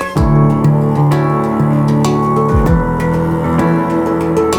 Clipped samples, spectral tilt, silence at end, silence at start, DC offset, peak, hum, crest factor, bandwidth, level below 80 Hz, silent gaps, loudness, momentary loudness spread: under 0.1%; -8 dB/octave; 0 s; 0 s; under 0.1%; 0 dBFS; none; 12 dB; 14 kHz; -24 dBFS; none; -13 LUFS; 4 LU